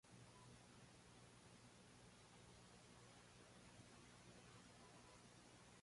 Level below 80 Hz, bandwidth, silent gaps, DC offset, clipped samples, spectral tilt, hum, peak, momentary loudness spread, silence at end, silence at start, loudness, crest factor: -80 dBFS; 11.5 kHz; none; under 0.1%; under 0.1%; -4 dB/octave; 60 Hz at -70 dBFS; -52 dBFS; 1 LU; 0 s; 0.05 s; -66 LUFS; 14 dB